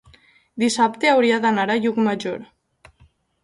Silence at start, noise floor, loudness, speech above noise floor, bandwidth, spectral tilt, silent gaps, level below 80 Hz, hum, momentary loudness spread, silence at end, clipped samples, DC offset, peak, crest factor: 0.55 s; -57 dBFS; -19 LUFS; 38 dB; 11.5 kHz; -4 dB/octave; none; -62 dBFS; none; 13 LU; 1 s; under 0.1%; under 0.1%; -4 dBFS; 18 dB